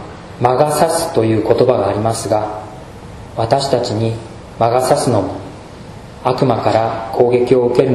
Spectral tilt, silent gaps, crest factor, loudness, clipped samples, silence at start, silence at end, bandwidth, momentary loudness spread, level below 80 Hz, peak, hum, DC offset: -6 dB/octave; none; 16 dB; -15 LUFS; under 0.1%; 0 s; 0 s; 13 kHz; 20 LU; -42 dBFS; 0 dBFS; none; under 0.1%